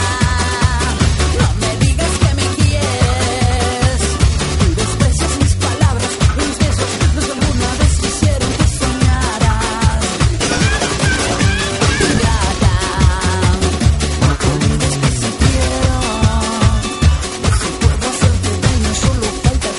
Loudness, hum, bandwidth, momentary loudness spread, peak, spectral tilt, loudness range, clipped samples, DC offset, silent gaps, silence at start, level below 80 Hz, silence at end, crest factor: -15 LUFS; none; 11.5 kHz; 1 LU; 0 dBFS; -4.5 dB/octave; 1 LU; under 0.1%; under 0.1%; none; 0 s; -18 dBFS; 0 s; 14 dB